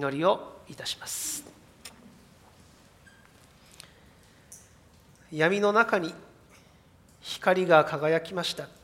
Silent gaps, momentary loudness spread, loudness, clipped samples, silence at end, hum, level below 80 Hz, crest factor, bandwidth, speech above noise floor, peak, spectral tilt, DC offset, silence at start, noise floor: none; 26 LU; -26 LUFS; under 0.1%; 0.15 s; none; -66 dBFS; 26 dB; 16 kHz; 31 dB; -4 dBFS; -4 dB/octave; under 0.1%; 0 s; -58 dBFS